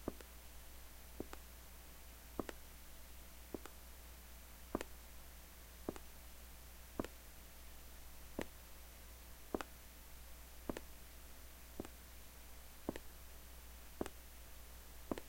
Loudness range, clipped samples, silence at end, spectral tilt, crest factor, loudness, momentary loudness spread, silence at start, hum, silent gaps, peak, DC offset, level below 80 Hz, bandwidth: 2 LU; under 0.1%; 0 s; -4.5 dB/octave; 30 dB; -53 LUFS; 8 LU; 0 s; none; none; -22 dBFS; under 0.1%; -58 dBFS; 16.5 kHz